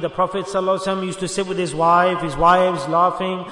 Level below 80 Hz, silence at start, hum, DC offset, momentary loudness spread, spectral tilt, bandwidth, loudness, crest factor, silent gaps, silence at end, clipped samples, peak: -44 dBFS; 0 s; none; under 0.1%; 9 LU; -5 dB/octave; 11 kHz; -19 LUFS; 16 dB; none; 0 s; under 0.1%; -2 dBFS